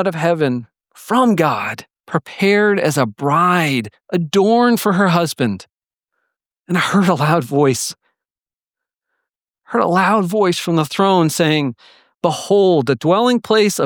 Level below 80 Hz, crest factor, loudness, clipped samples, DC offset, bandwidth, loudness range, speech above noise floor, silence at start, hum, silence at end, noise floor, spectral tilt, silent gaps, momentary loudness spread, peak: -66 dBFS; 16 dB; -16 LUFS; under 0.1%; under 0.1%; 19.5 kHz; 4 LU; over 75 dB; 0 s; none; 0 s; under -90 dBFS; -5.5 dB/octave; none; 9 LU; -2 dBFS